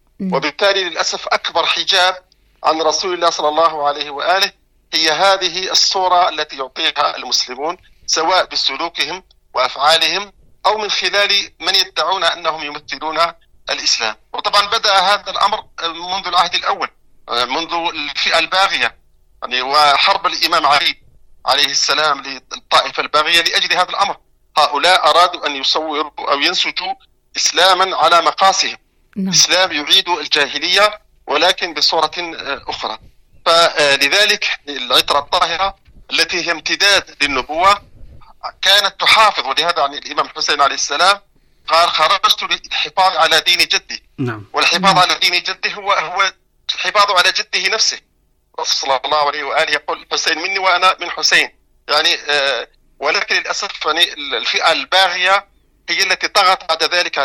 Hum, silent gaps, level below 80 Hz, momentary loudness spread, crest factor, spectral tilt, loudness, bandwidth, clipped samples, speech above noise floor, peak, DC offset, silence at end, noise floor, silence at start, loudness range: none; none; -52 dBFS; 11 LU; 16 dB; -1 dB/octave; -14 LUFS; 17.5 kHz; under 0.1%; 42 dB; 0 dBFS; under 0.1%; 0 s; -58 dBFS; 0.2 s; 3 LU